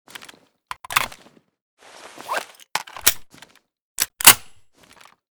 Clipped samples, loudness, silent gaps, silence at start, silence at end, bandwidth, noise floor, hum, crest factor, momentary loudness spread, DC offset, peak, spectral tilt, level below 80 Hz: 0.1%; -18 LUFS; 1.62-1.77 s, 3.81-3.95 s; 0.9 s; 0.95 s; over 20 kHz; -52 dBFS; none; 24 dB; 27 LU; under 0.1%; 0 dBFS; 1 dB/octave; -54 dBFS